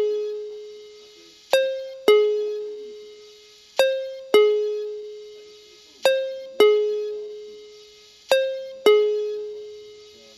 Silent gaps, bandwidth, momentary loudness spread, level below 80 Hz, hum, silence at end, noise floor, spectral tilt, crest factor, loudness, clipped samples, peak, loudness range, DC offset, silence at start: none; 13 kHz; 23 LU; -76 dBFS; none; 0.35 s; -49 dBFS; -1.5 dB/octave; 18 dB; -22 LUFS; under 0.1%; -4 dBFS; 2 LU; under 0.1%; 0 s